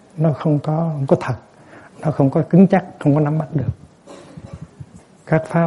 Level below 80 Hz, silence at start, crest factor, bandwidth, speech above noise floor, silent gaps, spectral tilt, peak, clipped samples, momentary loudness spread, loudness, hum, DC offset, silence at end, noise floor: -50 dBFS; 0.15 s; 18 dB; 11 kHz; 26 dB; none; -9.5 dB/octave; -2 dBFS; under 0.1%; 24 LU; -18 LUFS; none; under 0.1%; 0 s; -42 dBFS